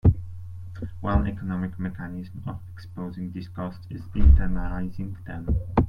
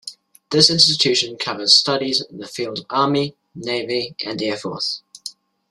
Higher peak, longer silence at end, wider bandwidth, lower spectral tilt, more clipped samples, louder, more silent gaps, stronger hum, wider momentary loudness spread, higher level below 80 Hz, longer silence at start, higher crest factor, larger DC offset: second, -4 dBFS vs 0 dBFS; second, 0 s vs 0.4 s; second, 5.2 kHz vs 14.5 kHz; first, -10 dB/octave vs -3 dB/octave; neither; second, -28 LUFS vs -17 LUFS; neither; neither; about the same, 17 LU vs 18 LU; first, -28 dBFS vs -60 dBFS; about the same, 0.05 s vs 0.05 s; about the same, 20 dB vs 20 dB; neither